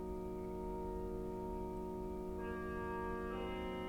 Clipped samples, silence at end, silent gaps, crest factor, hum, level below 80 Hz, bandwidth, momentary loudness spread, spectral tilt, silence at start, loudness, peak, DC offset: under 0.1%; 0 s; none; 12 dB; none; -52 dBFS; 19.5 kHz; 2 LU; -7.5 dB/octave; 0 s; -44 LUFS; -32 dBFS; under 0.1%